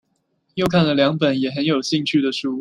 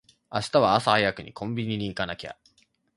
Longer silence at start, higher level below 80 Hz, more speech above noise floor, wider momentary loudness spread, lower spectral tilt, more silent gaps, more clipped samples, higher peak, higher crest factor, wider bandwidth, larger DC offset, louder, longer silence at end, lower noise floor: first, 0.55 s vs 0.3 s; about the same, -56 dBFS vs -56 dBFS; first, 50 dB vs 40 dB; second, 5 LU vs 14 LU; about the same, -5.5 dB/octave vs -5 dB/octave; neither; neither; about the same, -2 dBFS vs -4 dBFS; second, 18 dB vs 24 dB; first, 13.5 kHz vs 11.5 kHz; neither; first, -19 LUFS vs -25 LUFS; second, 0 s vs 0.65 s; about the same, -68 dBFS vs -65 dBFS